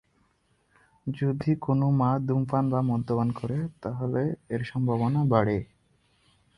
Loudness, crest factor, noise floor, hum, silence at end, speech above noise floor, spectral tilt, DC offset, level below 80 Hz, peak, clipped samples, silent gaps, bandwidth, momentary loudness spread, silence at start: -27 LUFS; 22 dB; -68 dBFS; none; 0.95 s; 43 dB; -10 dB/octave; under 0.1%; -56 dBFS; -6 dBFS; under 0.1%; none; 9.8 kHz; 9 LU; 1.05 s